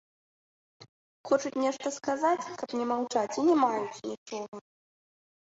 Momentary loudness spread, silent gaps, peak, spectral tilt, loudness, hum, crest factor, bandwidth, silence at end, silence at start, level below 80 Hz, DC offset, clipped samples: 14 LU; 0.89-1.24 s, 4.18-4.26 s, 4.48-4.52 s; -12 dBFS; -4 dB/octave; -30 LUFS; none; 20 dB; 8 kHz; 1 s; 0.8 s; -78 dBFS; under 0.1%; under 0.1%